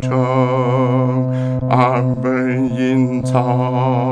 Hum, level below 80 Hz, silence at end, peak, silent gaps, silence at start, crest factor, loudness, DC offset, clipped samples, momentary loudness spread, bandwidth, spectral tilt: none; -48 dBFS; 0 s; 0 dBFS; none; 0 s; 14 dB; -16 LUFS; under 0.1%; under 0.1%; 3 LU; 9.4 kHz; -8.5 dB/octave